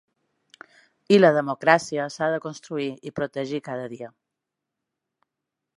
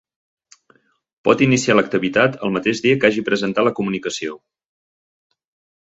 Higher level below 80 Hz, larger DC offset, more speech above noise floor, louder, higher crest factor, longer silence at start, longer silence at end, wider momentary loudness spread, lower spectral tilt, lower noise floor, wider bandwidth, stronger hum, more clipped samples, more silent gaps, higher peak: second, -70 dBFS vs -58 dBFS; neither; first, 62 dB vs 41 dB; second, -23 LUFS vs -18 LUFS; about the same, 24 dB vs 20 dB; second, 1.1 s vs 1.25 s; first, 1.7 s vs 1.5 s; first, 16 LU vs 9 LU; about the same, -5.5 dB/octave vs -5 dB/octave; first, -84 dBFS vs -58 dBFS; first, 11.5 kHz vs 8.2 kHz; neither; neither; neither; about the same, -2 dBFS vs 0 dBFS